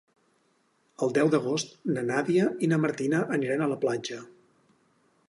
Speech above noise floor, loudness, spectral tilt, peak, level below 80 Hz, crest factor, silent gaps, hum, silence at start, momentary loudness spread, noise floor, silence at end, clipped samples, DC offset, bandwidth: 43 dB; -27 LUFS; -6 dB/octave; -12 dBFS; -74 dBFS; 18 dB; none; none; 1 s; 7 LU; -69 dBFS; 1.05 s; under 0.1%; under 0.1%; 11.5 kHz